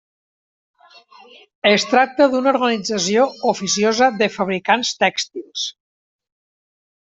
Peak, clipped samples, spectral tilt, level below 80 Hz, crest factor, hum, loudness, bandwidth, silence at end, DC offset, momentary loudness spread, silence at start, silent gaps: -2 dBFS; under 0.1%; -3 dB/octave; -64 dBFS; 18 dB; none; -18 LUFS; 8.2 kHz; 1.4 s; under 0.1%; 10 LU; 1.65 s; none